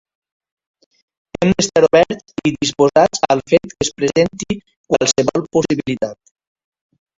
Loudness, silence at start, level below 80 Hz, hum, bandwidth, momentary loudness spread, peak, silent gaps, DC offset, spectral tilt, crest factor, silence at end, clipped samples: -16 LUFS; 1.4 s; -48 dBFS; none; 8 kHz; 11 LU; 0 dBFS; 4.77-4.84 s; under 0.1%; -4.5 dB/octave; 18 dB; 1.05 s; under 0.1%